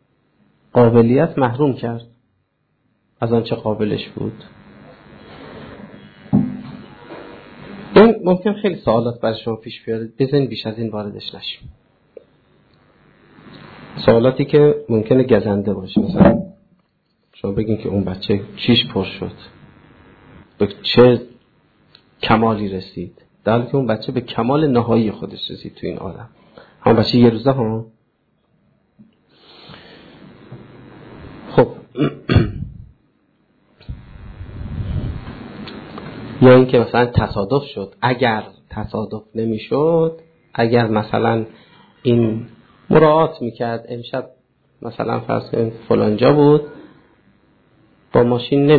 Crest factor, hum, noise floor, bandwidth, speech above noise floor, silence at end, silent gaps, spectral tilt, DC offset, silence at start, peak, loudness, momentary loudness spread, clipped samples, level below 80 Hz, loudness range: 18 dB; none; -66 dBFS; 4.9 kHz; 50 dB; 0 s; none; -9.5 dB/octave; under 0.1%; 0.75 s; 0 dBFS; -17 LUFS; 21 LU; under 0.1%; -42 dBFS; 9 LU